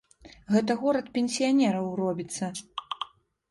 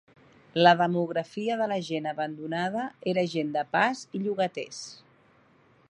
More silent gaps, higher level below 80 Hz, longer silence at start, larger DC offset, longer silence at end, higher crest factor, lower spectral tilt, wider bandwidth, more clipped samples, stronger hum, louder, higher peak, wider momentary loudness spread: neither; first, -66 dBFS vs -76 dBFS; second, 0.25 s vs 0.55 s; neither; second, 0.45 s vs 0.95 s; second, 18 dB vs 24 dB; about the same, -5 dB/octave vs -5.5 dB/octave; about the same, 11.5 kHz vs 10.5 kHz; neither; neither; about the same, -28 LUFS vs -27 LUFS; second, -10 dBFS vs -4 dBFS; about the same, 13 LU vs 12 LU